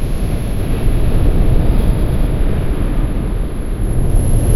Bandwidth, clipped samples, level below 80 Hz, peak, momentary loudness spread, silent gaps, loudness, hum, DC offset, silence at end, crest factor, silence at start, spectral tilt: 13.5 kHz; under 0.1%; -14 dBFS; 0 dBFS; 5 LU; none; -18 LUFS; none; under 0.1%; 0 s; 12 dB; 0 s; -7 dB/octave